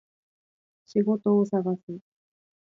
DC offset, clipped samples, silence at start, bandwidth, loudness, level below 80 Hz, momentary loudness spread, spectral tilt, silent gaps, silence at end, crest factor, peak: under 0.1%; under 0.1%; 0.95 s; 7.2 kHz; -26 LUFS; -76 dBFS; 16 LU; -10 dB/octave; 1.83-1.88 s; 0.7 s; 16 dB; -12 dBFS